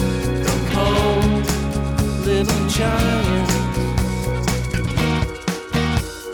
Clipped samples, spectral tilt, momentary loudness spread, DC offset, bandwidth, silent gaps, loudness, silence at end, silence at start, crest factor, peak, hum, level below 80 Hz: under 0.1%; -5.5 dB/octave; 5 LU; under 0.1%; 19 kHz; none; -20 LUFS; 0 s; 0 s; 12 dB; -6 dBFS; none; -26 dBFS